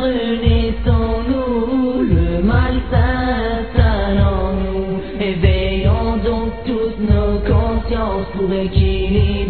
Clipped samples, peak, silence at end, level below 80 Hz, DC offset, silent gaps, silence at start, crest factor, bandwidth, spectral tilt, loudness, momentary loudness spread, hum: under 0.1%; 0 dBFS; 0 s; -20 dBFS; 2%; none; 0 s; 16 dB; 4.5 kHz; -11 dB/octave; -17 LUFS; 5 LU; none